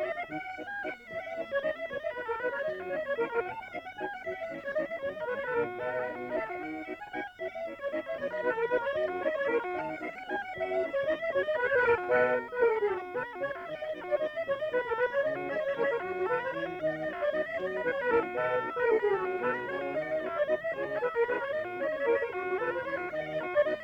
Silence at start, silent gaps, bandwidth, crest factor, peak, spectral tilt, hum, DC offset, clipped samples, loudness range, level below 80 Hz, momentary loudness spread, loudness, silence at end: 0 s; none; 7.8 kHz; 18 dB; -14 dBFS; -6 dB/octave; none; under 0.1%; under 0.1%; 6 LU; -66 dBFS; 10 LU; -32 LUFS; 0 s